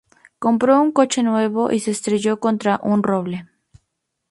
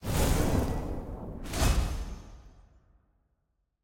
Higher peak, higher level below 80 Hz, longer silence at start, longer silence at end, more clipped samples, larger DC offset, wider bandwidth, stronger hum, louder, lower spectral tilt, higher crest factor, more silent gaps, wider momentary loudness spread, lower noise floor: first, -2 dBFS vs -12 dBFS; second, -62 dBFS vs -34 dBFS; first, 0.4 s vs 0 s; second, 0.85 s vs 1.25 s; neither; neither; second, 11.5 kHz vs 17 kHz; neither; first, -19 LUFS vs -31 LUFS; about the same, -5.5 dB/octave vs -5 dB/octave; about the same, 16 dB vs 18 dB; neither; second, 8 LU vs 15 LU; about the same, -75 dBFS vs -77 dBFS